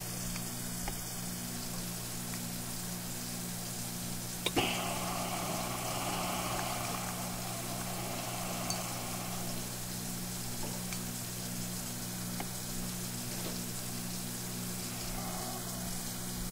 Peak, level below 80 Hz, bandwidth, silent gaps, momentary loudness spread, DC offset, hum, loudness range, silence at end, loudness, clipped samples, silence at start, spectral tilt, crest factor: -14 dBFS; -52 dBFS; 16 kHz; none; 4 LU; under 0.1%; 60 Hz at -45 dBFS; 3 LU; 0 s; -37 LUFS; under 0.1%; 0 s; -3 dB/octave; 22 dB